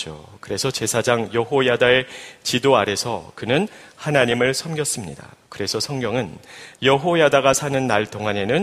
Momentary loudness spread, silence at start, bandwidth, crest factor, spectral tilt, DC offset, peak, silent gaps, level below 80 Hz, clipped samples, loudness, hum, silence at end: 14 LU; 0 s; 15.5 kHz; 20 dB; -4 dB/octave; under 0.1%; 0 dBFS; none; -54 dBFS; under 0.1%; -20 LUFS; none; 0 s